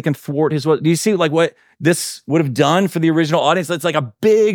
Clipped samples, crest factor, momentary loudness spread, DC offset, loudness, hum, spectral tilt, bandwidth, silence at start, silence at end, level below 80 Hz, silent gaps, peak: under 0.1%; 14 dB; 5 LU; under 0.1%; -17 LUFS; none; -5.5 dB/octave; 19 kHz; 0.05 s; 0 s; -68 dBFS; none; -2 dBFS